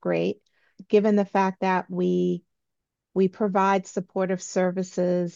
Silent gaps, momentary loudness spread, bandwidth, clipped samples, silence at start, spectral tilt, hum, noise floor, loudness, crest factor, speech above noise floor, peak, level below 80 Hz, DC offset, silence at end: none; 8 LU; 7.6 kHz; under 0.1%; 0.05 s; -6.5 dB/octave; none; -83 dBFS; -25 LUFS; 16 dB; 59 dB; -8 dBFS; -74 dBFS; under 0.1%; 0.05 s